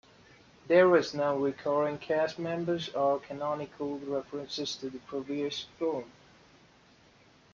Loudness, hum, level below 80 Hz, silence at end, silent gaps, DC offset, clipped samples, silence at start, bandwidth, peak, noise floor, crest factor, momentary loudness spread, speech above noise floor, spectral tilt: -31 LUFS; none; -70 dBFS; 1.45 s; none; under 0.1%; under 0.1%; 0.7 s; 7.4 kHz; -12 dBFS; -61 dBFS; 20 dB; 13 LU; 31 dB; -5.5 dB/octave